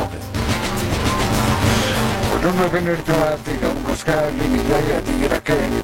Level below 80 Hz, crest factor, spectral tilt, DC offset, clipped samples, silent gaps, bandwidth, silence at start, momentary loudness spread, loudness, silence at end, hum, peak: -30 dBFS; 14 dB; -5 dB/octave; under 0.1%; under 0.1%; none; 16.5 kHz; 0 s; 5 LU; -19 LUFS; 0 s; none; -4 dBFS